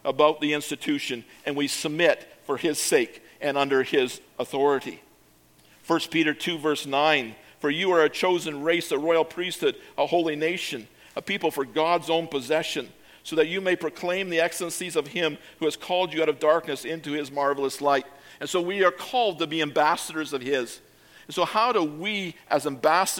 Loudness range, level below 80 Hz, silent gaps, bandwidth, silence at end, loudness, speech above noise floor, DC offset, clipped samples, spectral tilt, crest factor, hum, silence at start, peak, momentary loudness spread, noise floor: 3 LU; -70 dBFS; none; 17.5 kHz; 0 s; -25 LUFS; 33 dB; under 0.1%; under 0.1%; -3.5 dB/octave; 20 dB; none; 0.05 s; -6 dBFS; 9 LU; -58 dBFS